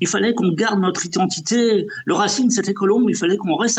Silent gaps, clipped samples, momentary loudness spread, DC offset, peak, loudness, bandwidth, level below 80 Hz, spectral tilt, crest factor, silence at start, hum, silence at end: none; under 0.1%; 3 LU; under 0.1%; -8 dBFS; -18 LUFS; 9.2 kHz; -64 dBFS; -4 dB/octave; 10 dB; 0 s; none; 0 s